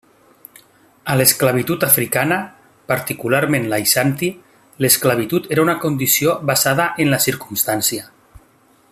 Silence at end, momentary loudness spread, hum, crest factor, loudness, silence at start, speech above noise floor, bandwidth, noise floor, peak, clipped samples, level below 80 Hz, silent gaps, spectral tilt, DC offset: 0.85 s; 8 LU; none; 18 dB; -16 LUFS; 1.05 s; 37 dB; 15.5 kHz; -54 dBFS; 0 dBFS; under 0.1%; -54 dBFS; none; -3.5 dB/octave; under 0.1%